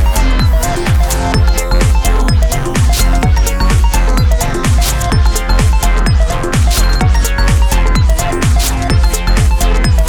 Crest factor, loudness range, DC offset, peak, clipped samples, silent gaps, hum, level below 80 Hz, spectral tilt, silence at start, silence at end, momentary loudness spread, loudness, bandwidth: 10 dB; 0 LU; under 0.1%; 0 dBFS; under 0.1%; none; none; -10 dBFS; -4.5 dB/octave; 0 s; 0 s; 1 LU; -12 LUFS; 19 kHz